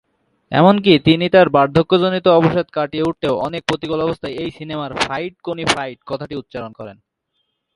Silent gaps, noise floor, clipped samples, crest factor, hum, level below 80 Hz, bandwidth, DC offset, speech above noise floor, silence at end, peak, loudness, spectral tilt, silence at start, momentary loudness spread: none; -71 dBFS; under 0.1%; 18 dB; none; -50 dBFS; 11.5 kHz; under 0.1%; 55 dB; 0.85 s; 0 dBFS; -16 LUFS; -6 dB/octave; 0.5 s; 16 LU